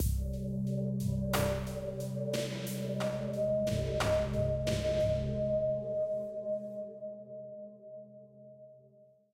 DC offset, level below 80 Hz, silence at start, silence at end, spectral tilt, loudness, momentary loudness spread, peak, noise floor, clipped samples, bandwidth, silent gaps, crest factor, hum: under 0.1%; -44 dBFS; 0 s; 0.3 s; -6 dB/octave; -34 LUFS; 18 LU; -16 dBFS; -62 dBFS; under 0.1%; 16 kHz; none; 18 dB; none